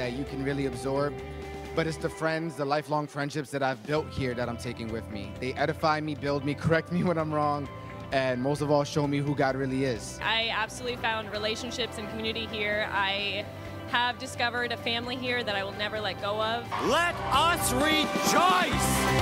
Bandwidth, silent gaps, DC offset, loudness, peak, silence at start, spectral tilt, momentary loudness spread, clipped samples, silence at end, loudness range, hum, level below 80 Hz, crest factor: 16 kHz; none; under 0.1%; -28 LUFS; -10 dBFS; 0 s; -4 dB/octave; 9 LU; under 0.1%; 0 s; 5 LU; none; -48 dBFS; 20 dB